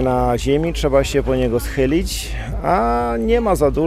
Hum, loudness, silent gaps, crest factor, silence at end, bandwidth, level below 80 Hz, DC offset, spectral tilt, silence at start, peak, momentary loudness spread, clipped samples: none; -18 LUFS; none; 14 dB; 0 s; 15.5 kHz; -26 dBFS; under 0.1%; -6 dB/octave; 0 s; -4 dBFS; 5 LU; under 0.1%